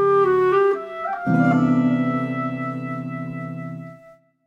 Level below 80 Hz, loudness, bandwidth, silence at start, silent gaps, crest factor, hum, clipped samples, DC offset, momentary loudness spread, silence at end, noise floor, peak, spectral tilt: -64 dBFS; -21 LUFS; 7.4 kHz; 0 s; none; 14 dB; none; under 0.1%; under 0.1%; 15 LU; 0.35 s; -50 dBFS; -6 dBFS; -9 dB/octave